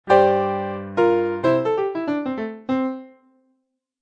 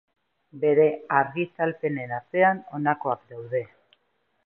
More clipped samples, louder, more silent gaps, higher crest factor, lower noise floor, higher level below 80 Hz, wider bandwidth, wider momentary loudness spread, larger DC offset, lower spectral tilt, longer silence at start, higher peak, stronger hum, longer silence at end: neither; first, -21 LUFS vs -25 LUFS; neither; about the same, 20 dB vs 20 dB; about the same, -72 dBFS vs -72 dBFS; first, -64 dBFS vs -76 dBFS; first, 8 kHz vs 3.6 kHz; about the same, 11 LU vs 10 LU; neither; second, -7.5 dB/octave vs -10.5 dB/octave; second, 0.05 s vs 0.55 s; first, -2 dBFS vs -6 dBFS; neither; first, 0.95 s vs 0.8 s